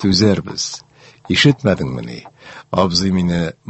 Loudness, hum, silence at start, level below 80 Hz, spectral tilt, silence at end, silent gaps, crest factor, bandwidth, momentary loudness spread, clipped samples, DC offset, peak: -16 LUFS; none; 0 s; -38 dBFS; -5 dB/octave; 0.2 s; none; 18 dB; 8.4 kHz; 18 LU; under 0.1%; under 0.1%; 0 dBFS